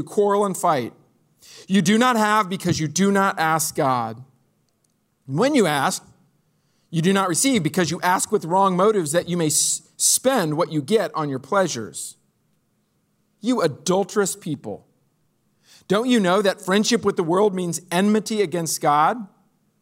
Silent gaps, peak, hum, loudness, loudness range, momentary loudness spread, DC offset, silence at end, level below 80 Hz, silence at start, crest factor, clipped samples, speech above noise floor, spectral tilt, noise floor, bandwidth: none; -4 dBFS; none; -20 LUFS; 6 LU; 11 LU; under 0.1%; 0.55 s; -66 dBFS; 0 s; 18 dB; under 0.1%; 47 dB; -4 dB/octave; -68 dBFS; 16 kHz